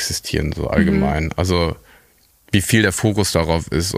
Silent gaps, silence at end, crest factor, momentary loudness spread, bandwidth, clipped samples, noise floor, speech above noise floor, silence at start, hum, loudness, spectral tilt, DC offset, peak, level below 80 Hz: none; 0 s; 18 dB; 6 LU; 15.5 kHz; under 0.1%; -55 dBFS; 37 dB; 0 s; none; -18 LUFS; -5 dB/octave; under 0.1%; 0 dBFS; -32 dBFS